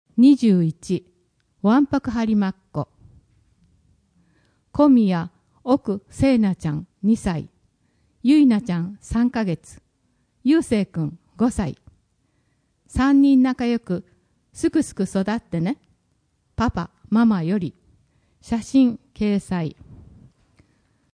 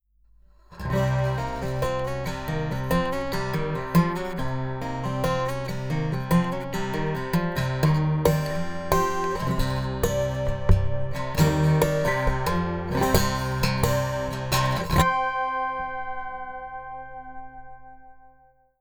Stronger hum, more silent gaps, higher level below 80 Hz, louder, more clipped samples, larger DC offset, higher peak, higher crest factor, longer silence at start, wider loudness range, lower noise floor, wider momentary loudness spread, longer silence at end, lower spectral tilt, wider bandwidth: second, none vs 50 Hz at -50 dBFS; neither; second, -46 dBFS vs -36 dBFS; first, -21 LUFS vs -25 LUFS; neither; neither; about the same, -6 dBFS vs -4 dBFS; about the same, 16 dB vs 20 dB; second, 0.15 s vs 0.7 s; about the same, 4 LU vs 4 LU; first, -67 dBFS vs -58 dBFS; first, 15 LU vs 11 LU; first, 1.2 s vs 0.55 s; about the same, -7 dB/octave vs -6 dB/octave; second, 10.5 kHz vs over 20 kHz